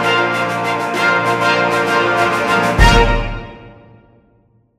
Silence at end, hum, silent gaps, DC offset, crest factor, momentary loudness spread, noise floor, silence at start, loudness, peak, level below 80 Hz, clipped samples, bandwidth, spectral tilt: 1.05 s; none; none; under 0.1%; 16 dB; 9 LU; -55 dBFS; 0 s; -14 LUFS; 0 dBFS; -24 dBFS; under 0.1%; 15.5 kHz; -4.5 dB/octave